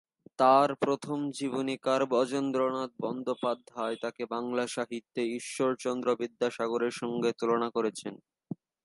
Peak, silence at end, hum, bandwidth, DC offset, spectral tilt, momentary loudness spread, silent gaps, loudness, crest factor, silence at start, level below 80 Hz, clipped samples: -10 dBFS; 0.3 s; none; 11.5 kHz; under 0.1%; -5 dB/octave; 9 LU; none; -30 LUFS; 20 dB; 0.4 s; -82 dBFS; under 0.1%